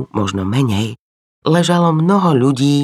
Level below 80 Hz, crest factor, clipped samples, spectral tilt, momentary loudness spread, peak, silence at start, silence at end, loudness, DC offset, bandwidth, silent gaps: -56 dBFS; 14 dB; under 0.1%; -6.5 dB/octave; 8 LU; -2 dBFS; 0 s; 0 s; -15 LUFS; under 0.1%; 14 kHz; 0.99-1.42 s